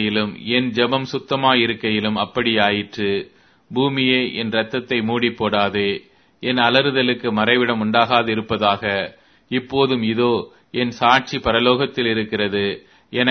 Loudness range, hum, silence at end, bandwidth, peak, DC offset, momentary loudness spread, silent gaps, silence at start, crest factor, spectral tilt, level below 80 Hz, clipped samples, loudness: 2 LU; none; 0 s; 6.4 kHz; 0 dBFS; under 0.1%; 8 LU; none; 0 s; 20 dB; -6 dB/octave; -52 dBFS; under 0.1%; -19 LUFS